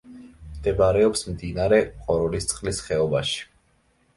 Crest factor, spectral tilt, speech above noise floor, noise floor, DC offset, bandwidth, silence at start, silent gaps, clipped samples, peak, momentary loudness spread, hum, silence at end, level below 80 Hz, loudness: 20 dB; -4.5 dB/octave; 41 dB; -64 dBFS; under 0.1%; 11.5 kHz; 0.05 s; none; under 0.1%; -4 dBFS; 9 LU; none; 0.75 s; -42 dBFS; -23 LUFS